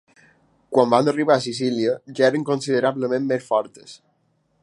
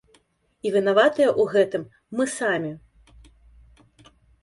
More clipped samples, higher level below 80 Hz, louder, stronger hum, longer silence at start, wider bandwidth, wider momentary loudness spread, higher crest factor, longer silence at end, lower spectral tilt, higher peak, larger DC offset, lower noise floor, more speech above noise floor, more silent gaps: neither; second, -72 dBFS vs -58 dBFS; about the same, -21 LUFS vs -22 LUFS; neither; about the same, 0.7 s vs 0.65 s; about the same, 11.5 kHz vs 11.5 kHz; second, 6 LU vs 14 LU; about the same, 20 dB vs 20 dB; second, 0.65 s vs 1.65 s; about the same, -5.5 dB/octave vs -4.5 dB/octave; about the same, -2 dBFS vs -4 dBFS; neither; about the same, -66 dBFS vs -63 dBFS; first, 46 dB vs 41 dB; neither